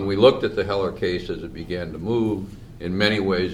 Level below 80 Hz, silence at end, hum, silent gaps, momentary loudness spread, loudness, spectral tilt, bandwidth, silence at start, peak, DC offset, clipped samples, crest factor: -44 dBFS; 0 s; none; none; 15 LU; -23 LUFS; -6.5 dB/octave; 12.5 kHz; 0 s; -2 dBFS; under 0.1%; under 0.1%; 20 dB